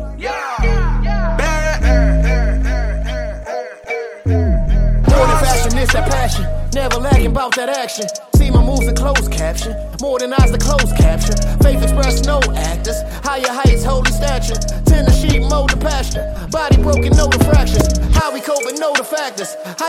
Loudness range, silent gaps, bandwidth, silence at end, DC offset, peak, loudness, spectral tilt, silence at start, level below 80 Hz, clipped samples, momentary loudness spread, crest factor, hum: 3 LU; none; 15.5 kHz; 0 s; under 0.1%; 0 dBFS; -16 LUFS; -5 dB/octave; 0 s; -16 dBFS; under 0.1%; 9 LU; 14 dB; none